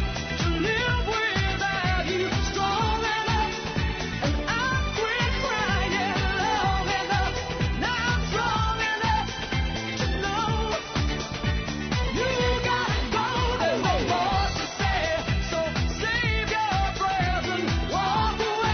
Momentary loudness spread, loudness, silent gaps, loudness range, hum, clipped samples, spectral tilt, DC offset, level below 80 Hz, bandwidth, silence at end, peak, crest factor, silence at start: 4 LU; -25 LUFS; none; 1 LU; none; under 0.1%; -4.5 dB/octave; under 0.1%; -34 dBFS; 6.6 kHz; 0 s; -12 dBFS; 14 dB; 0 s